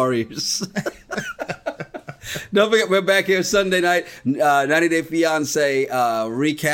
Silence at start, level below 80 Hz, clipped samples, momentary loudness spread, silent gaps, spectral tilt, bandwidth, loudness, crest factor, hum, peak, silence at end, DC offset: 0 s; -54 dBFS; under 0.1%; 13 LU; none; -3.5 dB/octave; 17 kHz; -19 LUFS; 18 dB; none; -2 dBFS; 0 s; under 0.1%